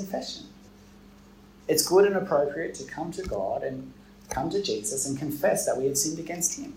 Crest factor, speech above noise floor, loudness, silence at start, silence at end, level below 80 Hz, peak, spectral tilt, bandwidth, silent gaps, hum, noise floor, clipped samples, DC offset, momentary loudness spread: 20 dB; 25 dB; -27 LUFS; 0 s; 0 s; -54 dBFS; -8 dBFS; -3.5 dB/octave; 16 kHz; none; none; -52 dBFS; under 0.1%; under 0.1%; 14 LU